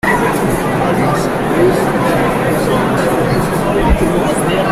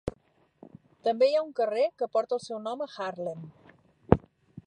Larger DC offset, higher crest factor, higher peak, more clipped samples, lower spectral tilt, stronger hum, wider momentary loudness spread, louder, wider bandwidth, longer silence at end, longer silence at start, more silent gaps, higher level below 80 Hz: neither; second, 12 dB vs 30 dB; about the same, -2 dBFS vs 0 dBFS; neither; about the same, -6 dB/octave vs -7 dB/octave; neither; second, 2 LU vs 13 LU; first, -14 LUFS vs -29 LUFS; first, 16 kHz vs 10 kHz; about the same, 0 s vs 0.05 s; about the same, 0.05 s vs 0.05 s; neither; first, -26 dBFS vs -50 dBFS